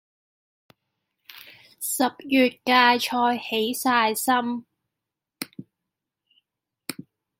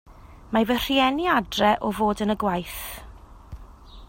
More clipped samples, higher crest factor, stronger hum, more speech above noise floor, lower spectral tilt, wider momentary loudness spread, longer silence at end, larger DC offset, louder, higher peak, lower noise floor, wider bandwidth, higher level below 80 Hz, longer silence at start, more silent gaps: neither; first, 24 dB vs 18 dB; neither; first, 64 dB vs 21 dB; second, -2 dB/octave vs -4.5 dB/octave; first, 20 LU vs 13 LU; first, 0.45 s vs 0.05 s; neither; about the same, -22 LUFS vs -23 LUFS; first, -2 dBFS vs -6 dBFS; first, -86 dBFS vs -44 dBFS; about the same, 16.5 kHz vs 16.5 kHz; second, -74 dBFS vs -44 dBFS; first, 1.3 s vs 0.1 s; neither